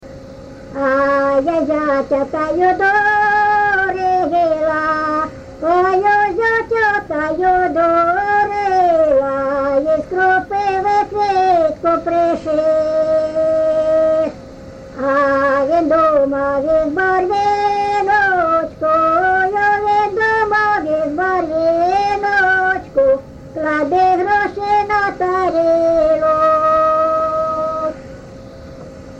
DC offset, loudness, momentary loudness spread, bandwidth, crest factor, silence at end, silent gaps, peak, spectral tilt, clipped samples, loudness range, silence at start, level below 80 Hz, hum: under 0.1%; -15 LUFS; 7 LU; 8.4 kHz; 12 dB; 0 s; none; -4 dBFS; -6 dB/octave; under 0.1%; 1 LU; 0.05 s; -44 dBFS; none